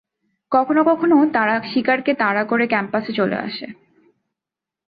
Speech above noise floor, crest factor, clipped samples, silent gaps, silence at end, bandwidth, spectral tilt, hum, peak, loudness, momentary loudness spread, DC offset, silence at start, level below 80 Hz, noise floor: 69 dB; 16 dB; under 0.1%; none; 1.2 s; 5 kHz; -9 dB/octave; none; -4 dBFS; -18 LUFS; 9 LU; under 0.1%; 0.5 s; -64 dBFS; -87 dBFS